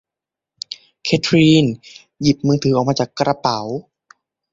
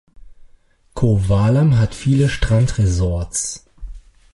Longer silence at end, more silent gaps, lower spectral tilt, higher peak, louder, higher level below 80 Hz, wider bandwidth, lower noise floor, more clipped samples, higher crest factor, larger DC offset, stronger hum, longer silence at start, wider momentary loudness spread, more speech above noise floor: first, 0.7 s vs 0.35 s; neither; about the same, -6 dB/octave vs -6 dB/octave; about the same, -2 dBFS vs -4 dBFS; about the same, -17 LUFS vs -17 LUFS; second, -52 dBFS vs -30 dBFS; second, 7.8 kHz vs 11.5 kHz; first, -87 dBFS vs -51 dBFS; neither; about the same, 18 dB vs 14 dB; neither; neither; first, 0.7 s vs 0.2 s; first, 18 LU vs 9 LU; first, 70 dB vs 35 dB